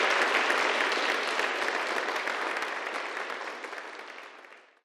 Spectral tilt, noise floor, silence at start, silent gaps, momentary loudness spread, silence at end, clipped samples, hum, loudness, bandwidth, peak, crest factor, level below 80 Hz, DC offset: 0 dB/octave; -52 dBFS; 0 s; none; 17 LU; 0.25 s; under 0.1%; none; -28 LUFS; 15 kHz; -12 dBFS; 18 dB; -82 dBFS; under 0.1%